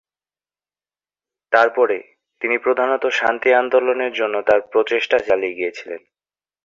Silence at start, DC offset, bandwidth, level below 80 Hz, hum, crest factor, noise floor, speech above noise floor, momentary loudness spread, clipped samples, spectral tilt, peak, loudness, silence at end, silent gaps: 1.5 s; under 0.1%; 7.4 kHz; -62 dBFS; 50 Hz at -75 dBFS; 18 dB; under -90 dBFS; over 72 dB; 11 LU; under 0.1%; -3.5 dB/octave; -2 dBFS; -18 LUFS; 0.65 s; none